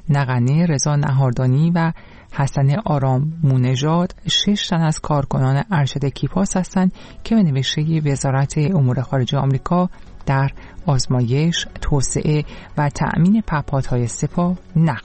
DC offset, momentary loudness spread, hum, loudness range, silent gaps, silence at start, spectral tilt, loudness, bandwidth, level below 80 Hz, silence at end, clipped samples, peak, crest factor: 0.2%; 5 LU; none; 2 LU; none; 0.05 s; -6 dB/octave; -19 LUFS; 8.8 kHz; -36 dBFS; 0 s; under 0.1%; -6 dBFS; 12 dB